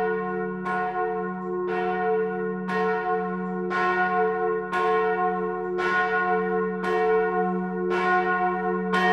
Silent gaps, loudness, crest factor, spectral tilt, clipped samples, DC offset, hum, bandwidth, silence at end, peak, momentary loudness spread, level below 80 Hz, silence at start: none; -25 LUFS; 14 dB; -7 dB/octave; under 0.1%; under 0.1%; none; 9 kHz; 0 s; -10 dBFS; 6 LU; -58 dBFS; 0 s